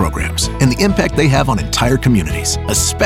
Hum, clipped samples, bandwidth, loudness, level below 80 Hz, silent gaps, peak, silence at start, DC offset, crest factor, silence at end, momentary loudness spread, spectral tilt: none; under 0.1%; 16.5 kHz; -14 LUFS; -24 dBFS; none; -2 dBFS; 0 s; under 0.1%; 12 dB; 0 s; 4 LU; -4.5 dB/octave